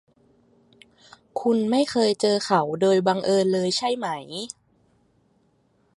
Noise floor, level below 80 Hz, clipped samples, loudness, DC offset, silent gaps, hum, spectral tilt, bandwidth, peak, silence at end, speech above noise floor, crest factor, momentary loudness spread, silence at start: -65 dBFS; -70 dBFS; under 0.1%; -22 LUFS; under 0.1%; none; none; -5 dB/octave; 11.5 kHz; -6 dBFS; 1.5 s; 43 dB; 20 dB; 13 LU; 1.35 s